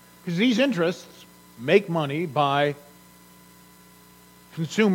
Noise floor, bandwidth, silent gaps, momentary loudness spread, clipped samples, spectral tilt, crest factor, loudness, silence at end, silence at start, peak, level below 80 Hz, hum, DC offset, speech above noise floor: -52 dBFS; 17 kHz; none; 17 LU; under 0.1%; -6 dB/octave; 22 dB; -24 LUFS; 0 s; 0.25 s; -4 dBFS; -68 dBFS; 60 Hz at -55 dBFS; under 0.1%; 29 dB